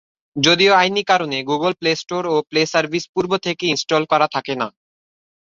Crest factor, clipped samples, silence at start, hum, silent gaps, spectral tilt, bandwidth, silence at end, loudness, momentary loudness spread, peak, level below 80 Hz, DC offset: 18 dB; under 0.1%; 0.35 s; none; 3.09-3.14 s; -3.5 dB/octave; 7.6 kHz; 0.9 s; -18 LUFS; 9 LU; -2 dBFS; -62 dBFS; under 0.1%